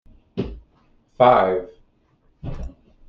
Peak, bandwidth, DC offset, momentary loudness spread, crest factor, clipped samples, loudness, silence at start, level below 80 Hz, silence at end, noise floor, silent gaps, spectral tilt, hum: -2 dBFS; 6 kHz; under 0.1%; 23 LU; 22 dB; under 0.1%; -19 LUFS; 0.35 s; -40 dBFS; 0.35 s; -61 dBFS; none; -8 dB/octave; none